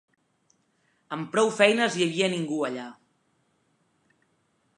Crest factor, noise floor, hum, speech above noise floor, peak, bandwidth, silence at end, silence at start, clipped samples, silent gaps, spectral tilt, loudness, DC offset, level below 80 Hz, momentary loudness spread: 24 dB; -70 dBFS; none; 46 dB; -4 dBFS; 11.5 kHz; 1.85 s; 1.1 s; under 0.1%; none; -4 dB/octave; -25 LUFS; under 0.1%; -82 dBFS; 17 LU